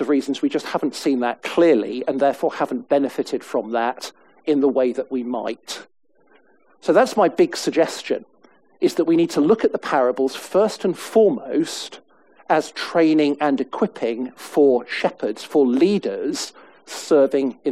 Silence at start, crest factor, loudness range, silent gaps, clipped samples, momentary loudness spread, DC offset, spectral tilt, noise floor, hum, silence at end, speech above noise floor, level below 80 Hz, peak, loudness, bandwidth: 0 s; 18 dB; 3 LU; none; under 0.1%; 11 LU; 0.1%; -5 dB/octave; -57 dBFS; none; 0 s; 37 dB; -66 dBFS; -2 dBFS; -20 LUFS; 15 kHz